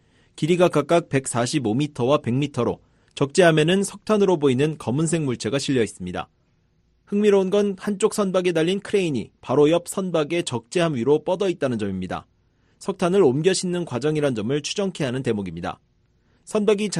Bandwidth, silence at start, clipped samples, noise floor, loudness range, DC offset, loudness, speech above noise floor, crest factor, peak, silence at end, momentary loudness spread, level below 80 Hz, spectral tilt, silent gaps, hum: 13 kHz; 0.35 s; under 0.1%; -64 dBFS; 3 LU; under 0.1%; -22 LUFS; 42 dB; 18 dB; -4 dBFS; 0 s; 10 LU; -58 dBFS; -5.5 dB/octave; none; none